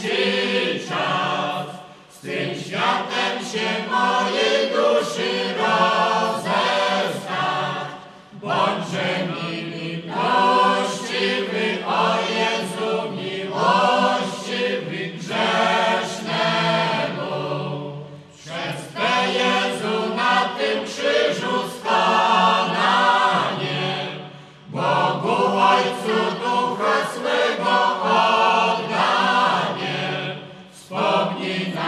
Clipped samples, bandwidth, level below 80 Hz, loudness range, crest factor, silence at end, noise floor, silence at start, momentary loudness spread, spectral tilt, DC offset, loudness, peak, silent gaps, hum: under 0.1%; 13.5 kHz; -68 dBFS; 4 LU; 16 dB; 0 s; -41 dBFS; 0 s; 11 LU; -4 dB/octave; under 0.1%; -20 LUFS; -4 dBFS; none; none